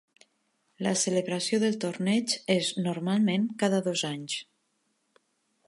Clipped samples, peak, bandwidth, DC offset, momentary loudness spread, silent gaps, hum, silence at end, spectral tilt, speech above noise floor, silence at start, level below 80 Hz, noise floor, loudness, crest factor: under 0.1%; -12 dBFS; 11.5 kHz; under 0.1%; 6 LU; none; none; 1.25 s; -4 dB/octave; 47 dB; 0.8 s; -78 dBFS; -75 dBFS; -28 LUFS; 18 dB